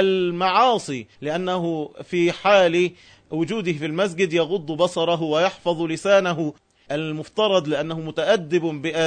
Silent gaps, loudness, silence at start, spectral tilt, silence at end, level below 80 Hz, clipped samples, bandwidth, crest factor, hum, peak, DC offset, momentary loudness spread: none; -22 LUFS; 0 s; -5 dB/octave; 0 s; -64 dBFS; under 0.1%; 9.6 kHz; 16 dB; none; -6 dBFS; under 0.1%; 10 LU